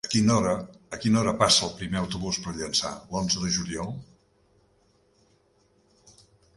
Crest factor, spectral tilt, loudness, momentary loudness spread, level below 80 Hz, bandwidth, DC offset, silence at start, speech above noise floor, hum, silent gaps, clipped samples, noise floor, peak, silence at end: 24 dB; -4 dB/octave; -25 LUFS; 13 LU; -52 dBFS; 11.5 kHz; under 0.1%; 0.05 s; 39 dB; none; none; under 0.1%; -65 dBFS; -4 dBFS; 2.55 s